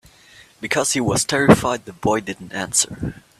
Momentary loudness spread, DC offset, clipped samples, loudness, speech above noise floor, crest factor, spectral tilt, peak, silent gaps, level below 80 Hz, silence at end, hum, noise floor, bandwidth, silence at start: 14 LU; under 0.1%; under 0.1%; -19 LUFS; 29 dB; 20 dB; -3.5 dB/octave; 0 dBFS; none; -46 dBFS; 0.2 s; none; -49 dBFS; 15 kHz; 0.6 s